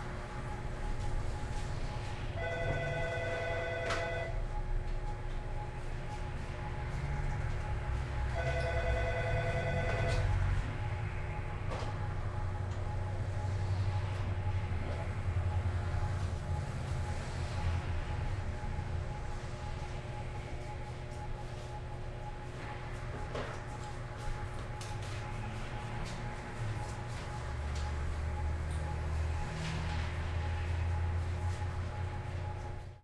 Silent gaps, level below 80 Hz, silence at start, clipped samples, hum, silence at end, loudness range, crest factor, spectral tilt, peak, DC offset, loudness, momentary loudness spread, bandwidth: none; -40 dBFS; 0 s; under 0.1%; none; 0.05 s; 7 LU; 16 dB; -6 dB/octave; -20 dBFS; under 0.1%; -38 LUFS; 8 LU; 11.5 kHz